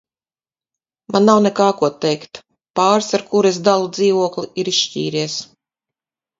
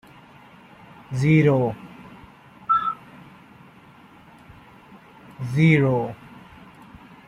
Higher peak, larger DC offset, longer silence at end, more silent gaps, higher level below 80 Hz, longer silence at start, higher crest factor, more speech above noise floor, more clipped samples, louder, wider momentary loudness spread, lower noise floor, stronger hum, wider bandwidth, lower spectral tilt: first, 0 dBFS vs -4 dBFS; neither; second, 0.95 s vs 1.15 s; first, 2.70-2.74 s vs none; second, -64 dBFS vs -58 dBFS; about the same, 1.1 s vs 1.1 s; about the same, 18 dB vs 20 dB; first, over 74 dB vs 31 dB; neither; first, -17 LUFS vs -21 LUFS; second, 11 LU vs 27 LU; first, under -90 dBFS vs -49 dBFS; neither; second, 7.8 kHz vs 10.5 kHz; second, -4.5 dB/octave vs -8 dB/octave